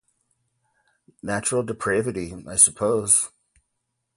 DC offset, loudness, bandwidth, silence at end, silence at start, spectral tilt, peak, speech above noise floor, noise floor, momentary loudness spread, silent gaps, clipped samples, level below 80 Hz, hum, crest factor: under 0.1%; -21 LUFS; 12 kHz; 0.9 s; 1.25 s; -3 dB/octave; 0 dBFS; 55 dB; -78 dBFS; 15 LU; none; under 0.1%; -56 dBFS; none; 26 dB